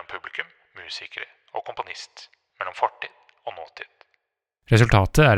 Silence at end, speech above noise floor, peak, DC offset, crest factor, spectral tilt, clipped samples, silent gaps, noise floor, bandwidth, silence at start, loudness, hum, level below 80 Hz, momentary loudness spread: 0 s; 57 dB; -2 dBFS; under 0.1%; 24 dB; -6 dB/octave; under 0.1%; none; -79 dBFS; 14.5 kHz; 0.1 s; -24 LUFS; none; -40 dBFS; 23 LU